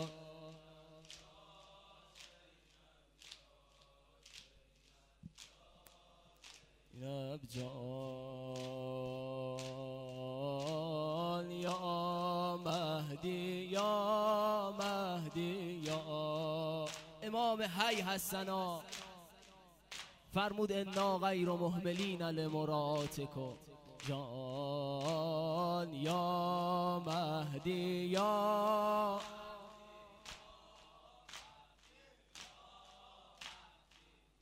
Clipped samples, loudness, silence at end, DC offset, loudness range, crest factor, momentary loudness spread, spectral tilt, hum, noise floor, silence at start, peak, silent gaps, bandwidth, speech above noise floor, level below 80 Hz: under 0.1%; -39 LUFS; 0.75 s; under 0.1%; 19 LU; 20 dB; 23 LU; -5 dB/octave; none; -69 dBFS; 0 s; -20 dBFS; none; 16 kHz; 32 dB; -72 dBFS